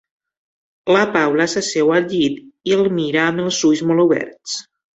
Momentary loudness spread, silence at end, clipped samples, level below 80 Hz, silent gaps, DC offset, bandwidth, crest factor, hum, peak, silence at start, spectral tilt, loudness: 12 LU; 0.35 s; under 0.1%; -60 dBFS; none; under 0.1%; 8.2 kHz; 16 dB; none; -2 dBFS; 0.85 s; -4.5 dB/octave; -17 LUFS